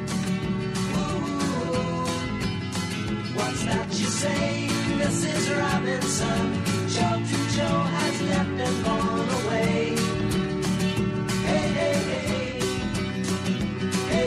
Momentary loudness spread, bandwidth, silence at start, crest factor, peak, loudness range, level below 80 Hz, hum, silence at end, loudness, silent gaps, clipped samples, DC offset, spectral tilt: 4 LU; 13 kHz; 0 s; 14 dB; -10 dBFS; 3 LU; -44 dBFS; none; 0 s; -25 LUFS; none; under 0.1%; under 0.1%; -5 dB/octave